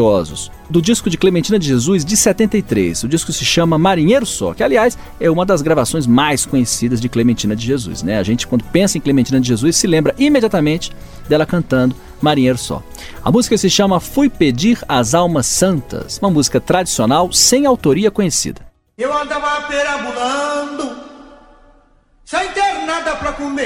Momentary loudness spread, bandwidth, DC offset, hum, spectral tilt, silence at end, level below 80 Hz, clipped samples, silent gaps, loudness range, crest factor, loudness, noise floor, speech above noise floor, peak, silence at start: 8 LU; 17 kHz; under 0.1%; none; -4.5 dB/octave; 0 s; -38 dBFS; under 0.1%; none; 7 LU; 14 dB; -15 LUFS; -50 dBFS; 36 dB; 0 dBFS; 0 s